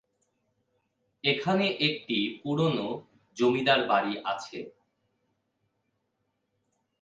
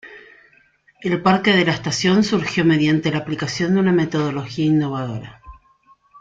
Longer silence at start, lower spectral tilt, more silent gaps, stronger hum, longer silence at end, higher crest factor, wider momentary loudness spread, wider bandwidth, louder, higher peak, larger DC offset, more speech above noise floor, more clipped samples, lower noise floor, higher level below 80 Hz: first, 1.25 s vs 0.05 s; about the same, -5.5 dB/octave vs -5.5 dB/octave; neither; neither; first, 2.3 s vs 0 s; first, 22 dB vs 16 dB; first, 17 LU vs 10 LU; about the same, 7.8 kHz vs 7.8 kHz; second, -27 LUFS vs -19 LUFS; second, -10 dBFS vs -2 dBFS; neither; first, 51 dB vs 38 dB; neither; first, -78 dBFS vs -56 dBFS; second, -74 dBFS vs -52 dBFS